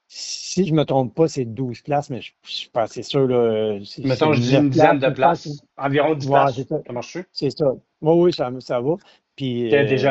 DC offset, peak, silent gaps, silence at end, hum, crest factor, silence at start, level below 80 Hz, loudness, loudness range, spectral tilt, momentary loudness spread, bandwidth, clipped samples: under 0.1%; 0 dBFS; none; 0 s; none; 18 dB; 0.15 s; -58 dBFS; -20 LUFS; 4 LU; -6 dB/octave; 12 LU; 8.2 kHz; under 0.1%